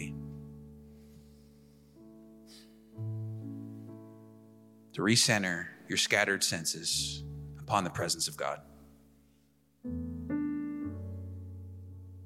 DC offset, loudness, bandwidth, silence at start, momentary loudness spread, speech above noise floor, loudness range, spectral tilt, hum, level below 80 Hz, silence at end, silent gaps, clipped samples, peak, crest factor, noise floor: under 0.1%; -32 LUFS; 16.5 kHz; 0 s; 24 LU; 37 dB; 17 LU; -3 dB/octave; none; -58 dBFS; 0 s; none; under 0.1%; -10 dBFS; 26 dB; -68 dBFS